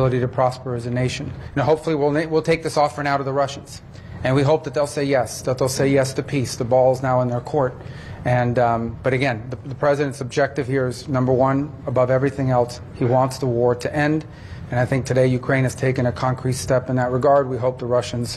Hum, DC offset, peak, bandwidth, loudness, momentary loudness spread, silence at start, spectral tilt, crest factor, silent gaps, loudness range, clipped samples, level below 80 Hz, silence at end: none; under 0.1%; -6 dBFS; 12.5 kHz; -21 LUFS; 8 LU; 0 s; -6.5 dB/octave; 14 dB; none; 2 LU; under 0.1%; -46 dBFS; 0 s